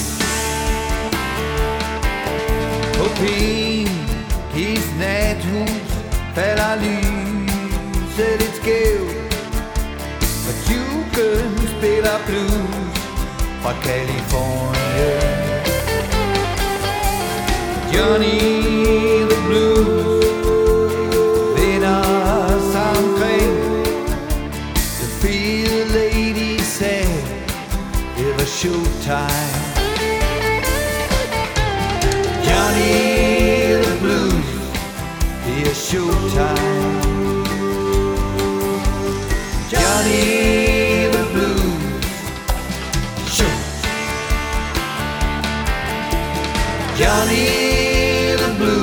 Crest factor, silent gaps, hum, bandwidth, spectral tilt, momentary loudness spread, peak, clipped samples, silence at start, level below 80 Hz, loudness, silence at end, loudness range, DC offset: 18 dB; none; none; over 20 kHz; -4.5 dB/octave; 8 LU; 0 dBFS; under 0.1%; 0 s; -26 dBFS; -18 LUFS; 0 s; 5 LU; under 0.1%